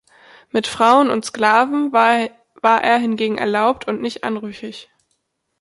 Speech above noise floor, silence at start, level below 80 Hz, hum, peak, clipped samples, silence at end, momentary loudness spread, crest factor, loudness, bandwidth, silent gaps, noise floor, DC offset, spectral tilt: 53 dB; 0.55 s; -62 dBFS; none; -2 dBFS; under 0.1%; 0.8 s; 13 LU; 16 dB; -17 LUFS; 11.5 kHz; none; -70 dBFS; under 0.1%; -4 dB/octave